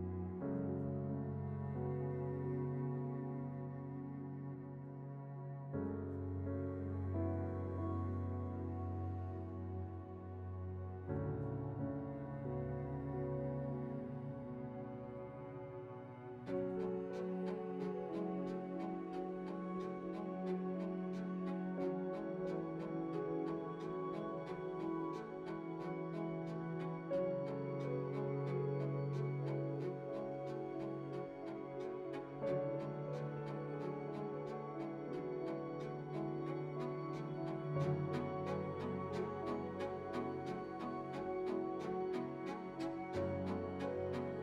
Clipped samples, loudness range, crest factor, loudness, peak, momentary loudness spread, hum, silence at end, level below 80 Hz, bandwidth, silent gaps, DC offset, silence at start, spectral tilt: under 0.1%; 3 LU; 16 dB; -43 LUFS; -28 dBFS; 7 LU; none; 0 s; -68 dBFS; 7.8 kHz; none; under 0.1%; 0 s; -9.5 dB/octave